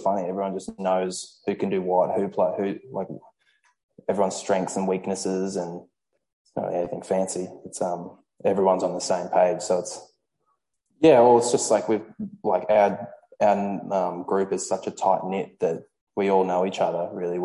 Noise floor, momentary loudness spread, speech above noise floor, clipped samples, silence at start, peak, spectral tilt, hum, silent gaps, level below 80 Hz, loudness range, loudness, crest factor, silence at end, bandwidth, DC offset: -74 dBFS; 13 LU; 50 dB; under 0.1%; 0 s; -4 dBFS; -5 dB/octave; none; 3.83-3.89 s, 6.33-6.45 s, 16.01-16.07 s; -66 dBFS; 7 LU; -24 LUFS; 20 dB; 0 s; 11.5 kHz; under 0.1%